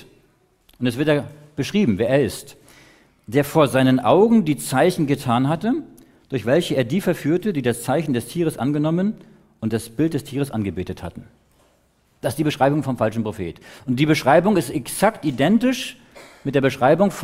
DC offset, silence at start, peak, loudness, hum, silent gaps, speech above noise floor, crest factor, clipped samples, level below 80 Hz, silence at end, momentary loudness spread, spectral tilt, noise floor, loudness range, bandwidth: under 0.1%; 0.8 s; -2 dBFS; -20 LUFS; none; none; 41 dB; 18 dB; under 0.1%; -52 dBFS; 0 s; 12 LU; -6 dB/octave; -61 dBFS; 6 LU; 16 kHz